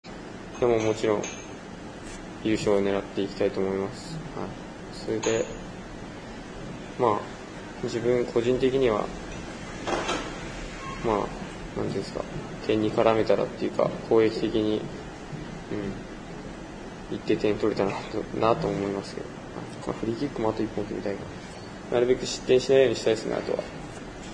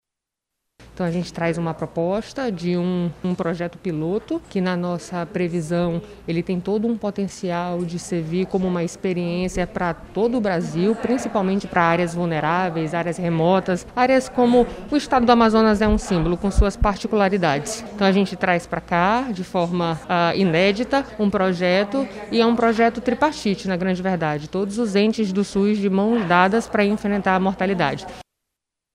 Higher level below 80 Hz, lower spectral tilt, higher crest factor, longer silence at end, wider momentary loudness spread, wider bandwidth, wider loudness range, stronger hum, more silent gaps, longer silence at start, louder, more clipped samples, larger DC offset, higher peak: second, -48 dBFS vs -38 dBFS; about the same, -5.5 dB/octave vs -6 dB/octave; about the same, 22 dB vs 18 dB; second, 0 s vs 0.7 s; first, 16 LU vs 8 LU; second, 10.5 kHz vs 12 kHz; about the same, 6 LU vs 6 LU; neither; neither; second, 0.05 s vs 0.8 s; second, -27 LUFS vs -21 LUFS; neither; neither; second, -6 dBFS vs -2 dBFS